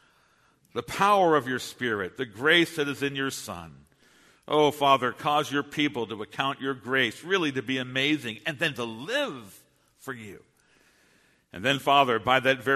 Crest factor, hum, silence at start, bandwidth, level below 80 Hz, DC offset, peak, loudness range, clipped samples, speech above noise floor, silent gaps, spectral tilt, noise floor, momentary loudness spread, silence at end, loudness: 22 dB; none; 0.75 s; 13.5 kHz; -66 dBFS; under 0.1%; -6 dBFS; 6 LU; under 0.1%; 38 dB; none; -4 dB/octave; -64 dBFS; 16 LU; 0 s; -26 LUFS